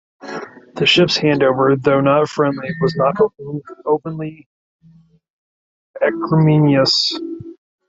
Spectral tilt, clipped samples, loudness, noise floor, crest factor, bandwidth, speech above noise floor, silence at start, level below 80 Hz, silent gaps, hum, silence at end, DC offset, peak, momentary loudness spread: -6 dB/octave; under 0.1%; -15 LUFS; -50 dBFS; 16 dB; 7.8 kHz; 34 dB; 0.2 s; -56 dBFS; 4.46-4.79 s, 5.30-5.94 s; none; 0.35 s; under 0.1%; -2 dBFS; 17 LU